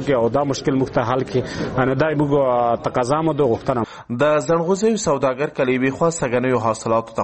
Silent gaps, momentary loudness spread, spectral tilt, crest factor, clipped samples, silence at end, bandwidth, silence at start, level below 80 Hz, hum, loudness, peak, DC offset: none; 4 LU; -6 dB/octave; 16 dB; under 0.1%; 0 s; 8.8 kHz; 0 s; -48 dBFS; none; -19 LUFS; -2 dBFS; under 0.1%